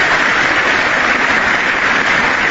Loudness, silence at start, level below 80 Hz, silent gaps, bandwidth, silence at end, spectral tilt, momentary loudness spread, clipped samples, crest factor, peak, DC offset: -11 LUFS; 0 s; -40 dBFS; none; 8 kHz; 0 s; -2.5 dB/octave; 1 LU; under 0.1%; 12 dB; -2 dBFS; under 0.1%